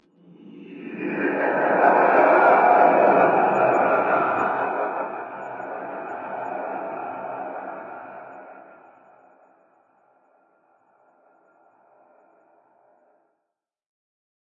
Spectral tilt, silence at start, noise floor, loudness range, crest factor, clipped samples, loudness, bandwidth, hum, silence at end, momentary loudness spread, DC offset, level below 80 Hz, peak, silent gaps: -8 dB/octave; 0.45 s; -82 dBFS; 19 LU; 20 dB; under 0.1%; -20 LUFS; 7.4 kHz; none; 5.85 s; 22 LU; under 0.1%; -78 dBFS; -4 dBFS; none